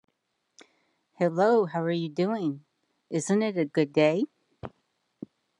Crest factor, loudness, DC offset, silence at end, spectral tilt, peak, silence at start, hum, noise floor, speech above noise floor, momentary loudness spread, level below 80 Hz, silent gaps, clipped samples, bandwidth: 20 dB; -27 LUFS; under 0.1%; 0.9 s; -6 dB/octave; -8 dBFS; 1.2 s; none; -77 dBFS; 51 dB; 22 LU; -74 dBFS; none; under 0.1%; 11.5 kHz